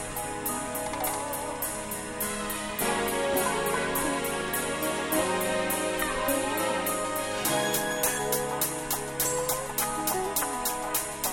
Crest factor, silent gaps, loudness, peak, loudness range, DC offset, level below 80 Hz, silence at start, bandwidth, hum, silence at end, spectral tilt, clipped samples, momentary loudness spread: 18 dB; none; -28 LUFS; -12 dBFS; 2 LU; under 0.1%; -50 dBFS; 0 s; 17.5 kHz; none; 0 s; -2.5 dB/octave; under 0.1%; 5 LU